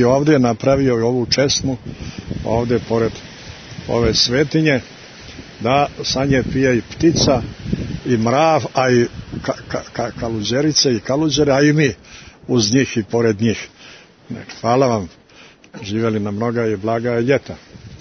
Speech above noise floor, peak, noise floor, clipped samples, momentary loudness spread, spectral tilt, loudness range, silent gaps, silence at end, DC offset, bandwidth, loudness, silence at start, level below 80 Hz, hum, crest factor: 28 dB; 0 dBFS; -45 dBFS; under 0.1%; 19 LU; -5 dB/octave; 4 LU; none; 0.05 s; under 0.1%; 6.6 kHz; -17 LUFS; 0 s; -40 dBFS; none; 16 dB